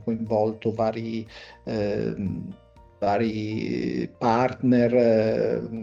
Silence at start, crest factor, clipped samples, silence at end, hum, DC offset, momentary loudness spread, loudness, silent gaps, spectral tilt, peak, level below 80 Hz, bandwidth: 0 s; 16 dB; under 0.1%; 0 s; none; under 0.1%; 13 LU; -25 LUFS; none; -8 dB/octave; -10 dBFS; -54 dBFS; 7.4 kHz